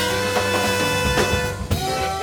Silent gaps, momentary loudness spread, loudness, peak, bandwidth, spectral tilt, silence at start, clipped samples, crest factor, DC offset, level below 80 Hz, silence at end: none; 4 LU; -20 LUFS; -6 dBFS; over 20 kHz; -3.5 dB/octave; 0 s; under 0.1%; 16 dB; under 0.1%; -34 dBFS; 0 s